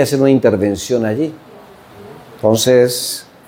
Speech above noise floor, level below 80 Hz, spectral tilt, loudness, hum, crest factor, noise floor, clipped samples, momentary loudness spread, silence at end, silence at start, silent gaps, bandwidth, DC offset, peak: 26 dB; -54 dBFS; -5 dB/octave; -14 LUFS; none; 16 dB; -39 dBFS; under 0.1%; 9 LU; 0.25 s; 0 s; none; 17 kHz; under 0.1%; 0 dBFS